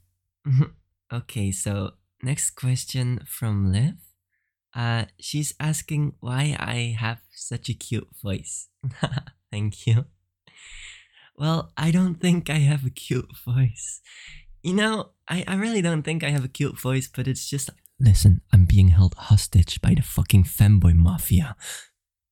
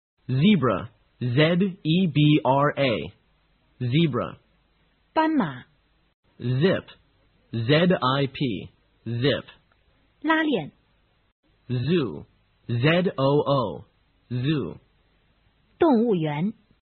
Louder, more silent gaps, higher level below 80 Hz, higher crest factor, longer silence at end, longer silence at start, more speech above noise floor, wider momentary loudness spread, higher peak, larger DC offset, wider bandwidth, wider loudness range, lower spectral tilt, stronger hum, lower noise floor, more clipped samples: about the same, -23 LUFS vs -24 LUFS; second, none vs 6.14-6.23 s, 11.32-11.43 s; first, -34 dBFS vs -58 dBFS; about the same, 18 dB vs 20 dB; about the same, 0.5 s vs 0.4 s; first, 0.45 s vs 0.3 s; first, 56 dB vs 43 dB; first, 17 LU vs 14 LU; about the same, -4 dBFS vs -4 dBFS; neither; first, 17 kHz vs 4.4 kHz; first, 10 LU vs 5 LU; about the same, -5.5 dB/octave vs -5.5 dB/octave; neither; first, -78 dBFS vs -65 dBFS; neither